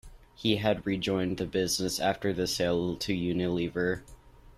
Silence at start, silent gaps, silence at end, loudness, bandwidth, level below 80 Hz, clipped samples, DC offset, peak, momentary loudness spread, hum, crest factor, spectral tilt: 0.05 s; none; 0.05 s; -30 LUFS; 14.5 kHz; -54 dBFS; under 0.1%; under 0.1%; -12 dBFS; 3 LU; none; 18 dB; -4.5 dB/octave